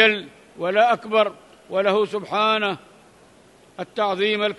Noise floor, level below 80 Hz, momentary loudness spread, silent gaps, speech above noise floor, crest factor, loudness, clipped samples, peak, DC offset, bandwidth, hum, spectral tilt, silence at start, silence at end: -52 dBFS; -70 dBFS; 13 LU; none; 31 dB; 20 dB; -21 LUFS; under 0.1%; -2 dBFS; under 0.1%; 11.5 kHz; none; -4.5 dB/octave; 0 s; 0.05 s